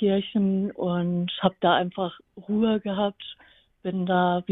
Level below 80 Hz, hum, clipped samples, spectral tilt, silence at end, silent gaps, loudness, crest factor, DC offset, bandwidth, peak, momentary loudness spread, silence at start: -60 dBFS; none; under 0.1%; -10 dB/octave; 0 s; none; -25 LUFS; 20 dB; under 0.1%; 4 kHz; -6 dBFS; 10 LU; 0 s